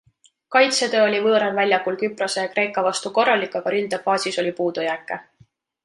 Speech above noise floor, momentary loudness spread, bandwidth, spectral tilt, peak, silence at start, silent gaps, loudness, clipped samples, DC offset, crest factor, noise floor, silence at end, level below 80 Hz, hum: 37 dB; 8 LU; 11.5 kHz; -3 dB/octave; -4 dBFS; 0.5 s; none; -20 LUFS; under 0.1%; under 0.1%; 18 dB; -57 dBFS; 0.6 s; -74 dBFS; none